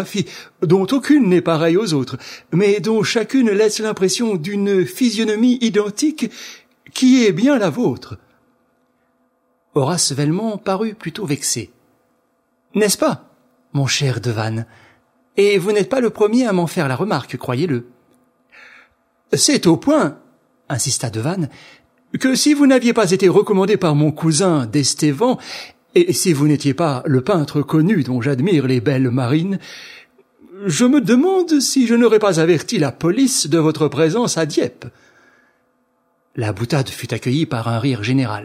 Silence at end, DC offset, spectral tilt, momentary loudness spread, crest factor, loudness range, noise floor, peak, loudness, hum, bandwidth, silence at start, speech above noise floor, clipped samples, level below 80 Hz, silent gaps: 0 s; under 0.1%; -5 dB/octave; 11 LU; 16 dB; 6 LU; -64 dBFS; 0 dBFS; -17 LUFS; none; 16 kHz; 0 s; 48 dB; under 0.1%; -60 dBFS; none